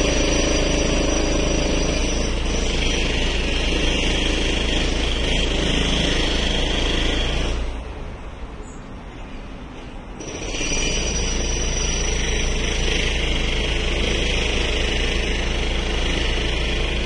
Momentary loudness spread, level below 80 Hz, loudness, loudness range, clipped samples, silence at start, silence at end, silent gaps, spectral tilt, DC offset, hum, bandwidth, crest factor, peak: 16 LU; -24 dBFS; -21 LUFS; 7 LU; under 0.1%; 0 s; 0 s; none; -3.5 dB/octave; under 0.1%; none; 11 kHz; 16 dB; -6 dBFS